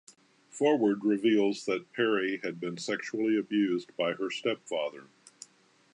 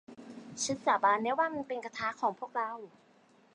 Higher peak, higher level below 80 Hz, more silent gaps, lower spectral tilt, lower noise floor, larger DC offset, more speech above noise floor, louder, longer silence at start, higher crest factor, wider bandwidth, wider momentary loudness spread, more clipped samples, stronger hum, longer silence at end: about the same, -14 dBFS vs -14 dBFS; second, -84 dBFS vs -76 dBFS; neither; first, -5 dB/octave vs -2.5 dB/octave; about the same, -63 dBFS vs -64 dBFS; neither; about the same, 34 dB vs 32 dB; about the same, -30 LUFS vs -32 LUFS; first, 0.55 s vs 0.1 s; about the same, 16 dB vs 20 dB; about the same, 10.5 kHz vs 10.5 kHz; second, 10 LU vs 19 LU; neither; neither; first, 0.9 s vs 0.65 s